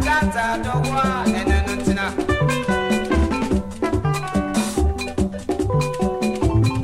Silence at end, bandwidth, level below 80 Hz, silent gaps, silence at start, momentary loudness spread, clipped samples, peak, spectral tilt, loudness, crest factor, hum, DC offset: 0 s; 15.5 kHz; -28 dBFS; none; 0 s; 4 LU; under 0.1%; -6 dBFS; -6 dB/octave; -21 LUFS; 14 dB; none; under 0.1%